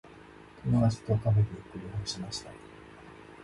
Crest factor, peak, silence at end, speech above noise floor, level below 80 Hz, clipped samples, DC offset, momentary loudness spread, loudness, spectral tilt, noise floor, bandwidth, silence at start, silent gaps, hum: 18 dB; -14 dBFS; 0 s; 22 dB; -52 dBFS; under 0.1%; under 0.1%; 23 LU; -30 LUFS; -6.5 dB/octave; -52 dBFS; 11.5 kHz; 0.05 s; none; none